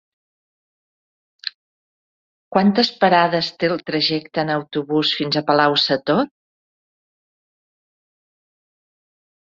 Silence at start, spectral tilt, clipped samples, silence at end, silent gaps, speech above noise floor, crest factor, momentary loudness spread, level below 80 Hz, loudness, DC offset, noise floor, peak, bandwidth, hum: 1.45 s; -6 dB/octave; under 0.1%; 3.25 s; 1.54-2.51 s; over 72 dB; 20 dB; 11 LU; -64 dBFS; -18 LUFS; under 0.1%; under -90 dBFS; -2 dBFS; 7.6 kHz; none